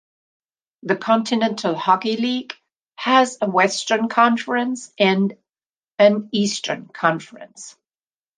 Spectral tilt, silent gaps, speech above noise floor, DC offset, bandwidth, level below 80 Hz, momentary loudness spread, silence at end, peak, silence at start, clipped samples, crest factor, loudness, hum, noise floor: -4.5 dB/octave; 5.66-5.70 s; over 71 dB; under 0.1%; 9.8 kHz; -72 dBFS; 20 LU; 0.7 s; -2 dBFS; 0.85 s; under 0.1%; 20 dB; -19 LUFS; none; under -90 dBFS